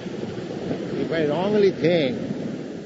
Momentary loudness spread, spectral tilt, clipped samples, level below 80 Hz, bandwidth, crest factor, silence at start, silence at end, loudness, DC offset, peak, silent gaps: 12 LU; -7 dB/octave; under 0.1%; -58 dBFS; 8 kHz; 18 dB; 0 s; 0 s; -24 LUFS; under 0.1%; -6 dBFS; none